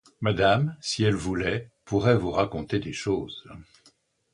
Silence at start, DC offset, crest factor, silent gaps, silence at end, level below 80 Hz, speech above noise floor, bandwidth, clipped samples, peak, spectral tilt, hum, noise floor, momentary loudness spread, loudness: 0.2 s; under 0.1%; 20 dB; none; 0.7 s; -48 dBFS; 37 dB; 11 kHz; under 0.1%; -8 dBFS; -6 dB/octave; none; -63 dBFS; 8 LU; -26 LUFS